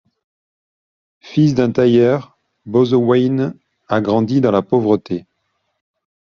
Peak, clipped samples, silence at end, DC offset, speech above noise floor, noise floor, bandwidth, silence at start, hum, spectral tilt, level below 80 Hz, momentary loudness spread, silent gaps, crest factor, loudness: 0 dBFS; under 0.1%; 1.15 s; under 0.1%; 55 dB; -69 dBFS; 7 kHz; 1.25 s; none; -7 dB/octave; -56 dBFS; 9 LU; none; 16 dB; -16 LUFS